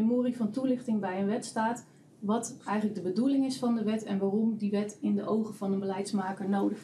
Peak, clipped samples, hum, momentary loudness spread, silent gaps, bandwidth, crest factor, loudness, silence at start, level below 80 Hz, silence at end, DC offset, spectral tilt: -16 dBFS; under 0.1%; none; 4 LU; none; 12.5 kHz; 12 dB; -31 LUFS; 0 s; -84 dBFS; 0 s; under 0.1%; -6.5 dB/octave